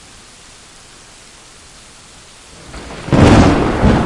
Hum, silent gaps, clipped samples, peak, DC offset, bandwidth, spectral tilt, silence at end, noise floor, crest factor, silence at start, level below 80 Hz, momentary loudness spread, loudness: none; none; 0.2%; 0 dBFS; under 0.1%; 11.5 kHz; -6.5 dB/octave; 0 s; -40 dBFS; 16 dB; 2.75 s; -26 dBFS; 25 LU; -11 LUFS